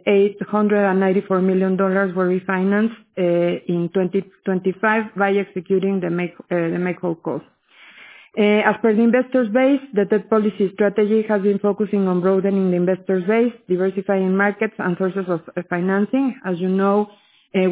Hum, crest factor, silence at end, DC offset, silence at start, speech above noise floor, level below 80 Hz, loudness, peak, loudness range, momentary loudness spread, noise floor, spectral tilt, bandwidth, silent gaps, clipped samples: none; 16 dB; 0 s; under 0.1%; 0.05 s; 29 dB; -66 dBFS; -19 LUFS; -2 dBFS; 3 LU; 7 LU; -47 dBFS; -11.5 dB/octave; 4 kHz; none; under 0.1%